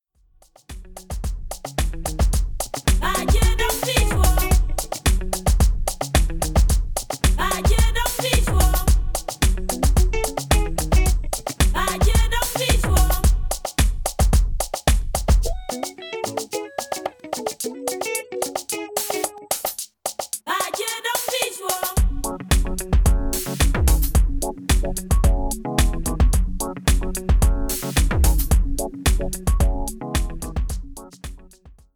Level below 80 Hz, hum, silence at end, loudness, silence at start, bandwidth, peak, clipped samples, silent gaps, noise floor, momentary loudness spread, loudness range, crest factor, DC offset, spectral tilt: -22 dBFS; none; 0.2 s; -22 LUFS; 0.7 s; over 20 kHz; -2 dBFS; under 0.1%; none; -56 dBFS; 9 LU; 5 LU; 18 dB; under 0.1%; -4 dB/octave